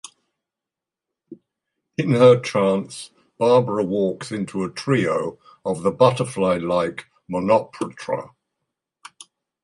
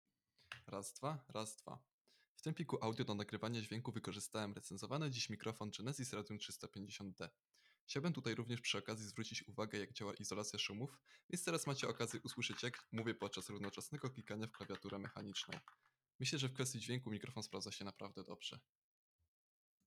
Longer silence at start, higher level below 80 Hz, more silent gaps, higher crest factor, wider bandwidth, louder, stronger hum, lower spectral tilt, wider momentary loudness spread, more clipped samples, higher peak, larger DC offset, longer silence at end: first, 1.3 s vs 0.5 s; first, -58 dBFS vs -86 dBFS; second, none vs 1.93-2.05 s, 2.28-2.36 s, 7.81-7.87 s, 11.23-11.29 s, 16.15-16.19 s; about the same, 22 dB vs 20 dB; second, 11.5 kHz vs 16 kHz; first, -21 LUFS vs -46 LUFS; neither; first, -6.5 dB/octave vs -4 dB/octave; first, 16 LU vs 9 LU; neither; first, 0 dBFS vs -26 dBFS; neither; about the same, 1.35 s vs 1.25 s